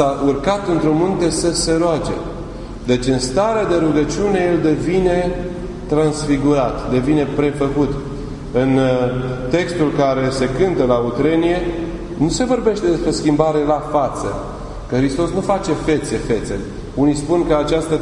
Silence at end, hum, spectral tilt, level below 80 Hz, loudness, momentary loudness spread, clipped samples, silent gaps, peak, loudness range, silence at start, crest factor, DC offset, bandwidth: 0 s; none; -6 dB/octave; -32 dBFS; -17 LUFS; 10 LU; under 0.1%; none; 0 dBFS; 1 LU; 0 s; 16 dB; under 0.1%; 11 kHz